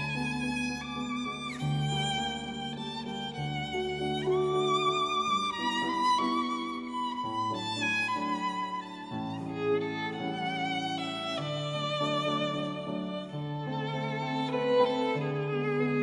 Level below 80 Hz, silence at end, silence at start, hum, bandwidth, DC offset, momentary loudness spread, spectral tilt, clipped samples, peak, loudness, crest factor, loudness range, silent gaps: -60 dBFS; 0 s; 0 s; none; 11 kHz; under 0.1%; 9 LU; -5 dB/octave; under 0.1%; -14 dBFS; -31 LUFS; 16 dB; 4 LU; none